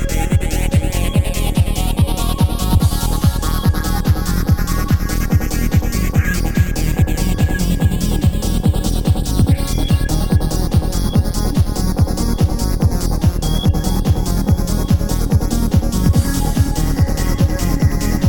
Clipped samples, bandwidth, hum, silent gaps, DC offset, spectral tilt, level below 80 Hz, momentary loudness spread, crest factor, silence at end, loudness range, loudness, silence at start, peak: under 0.1%; 17.5 kHz; none; none; 0.3%; -6 dB/octave; -18 dBFS; 2 LU; 14 dB; 0 s; 1 LU; -17 LUFS; 0 s; -2 dBFS